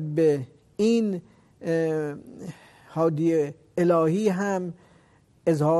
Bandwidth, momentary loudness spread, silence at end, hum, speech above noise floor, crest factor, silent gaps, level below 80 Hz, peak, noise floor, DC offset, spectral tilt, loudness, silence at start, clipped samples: 12.5 kHz; 16 LU; 0 s; none; 35 dB; 16 dB; none; -66 dBFS; -10 dBFS; -59 dBFS; under 0.1%; -7.5 dB/octave; -25 LUFS; 0 s; under 0.1%